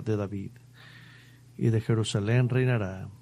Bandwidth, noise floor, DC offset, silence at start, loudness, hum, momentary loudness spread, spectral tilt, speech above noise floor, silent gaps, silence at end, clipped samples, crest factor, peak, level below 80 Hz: 10.5 kHz; -52 dBFS; under 0.1%; 0 s; -28 LUFS; none; 18 LU; -7 dB/octave; 25 dB; none; 0.05 s; under 0.1%; 16 dB; -12 dBFS; -62 dBFS